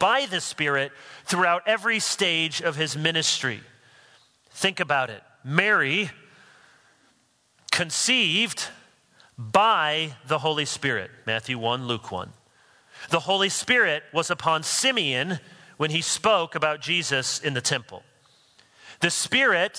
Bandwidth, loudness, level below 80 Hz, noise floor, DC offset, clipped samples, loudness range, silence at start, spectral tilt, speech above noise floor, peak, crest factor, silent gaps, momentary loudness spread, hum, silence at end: 11 kHz; -23 LUFS; -70 dBFS; -65 dBFS; under 0.1%; under 0.1%; 3 LU; 0 s; -2.5 dB/octave; 40 dB; 0 dBFS; 26 dB; none; 10 LU; none; 0 s